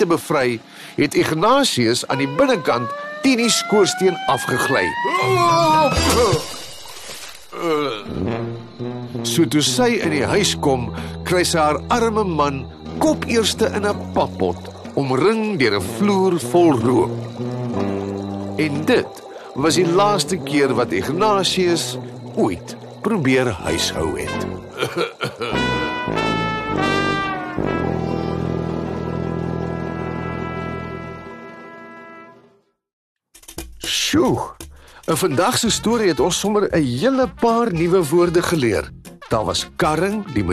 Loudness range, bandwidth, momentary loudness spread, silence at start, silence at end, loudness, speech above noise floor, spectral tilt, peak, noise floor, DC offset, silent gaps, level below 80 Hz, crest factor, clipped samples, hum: 7 LU; 13 kHz; 14 LU; 0 s; 0 s; -19 LUFS; 38 dB; -4.5 dB/octave; -4 dBFS; -56 dBFS; under 0.1%; 32.93-33.16 s; -42 dBFS; 14 dB; under 0.1%; none